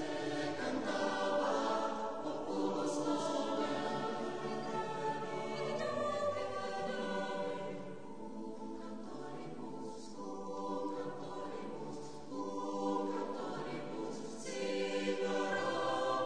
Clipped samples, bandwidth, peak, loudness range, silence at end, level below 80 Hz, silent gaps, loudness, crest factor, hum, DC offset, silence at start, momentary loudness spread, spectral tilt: under 0.1%; 10 kHz; -22 dBFS; 8 LU; 0 s; -72 dBFS; none; -39 LUFS; 16 dB; none; 0.3%; 0 s; 11 LU; -4.5 dB/octave